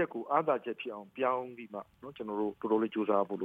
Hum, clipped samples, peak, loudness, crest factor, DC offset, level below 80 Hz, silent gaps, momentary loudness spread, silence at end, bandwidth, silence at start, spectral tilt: none; under 0.1%; -14 dBFS; -33 LUFS; 20 dB; under 0.1%; -76 dBFS; none; 14 LU; 0 s; 4.3 kHz; 0 s; -8 dB/octave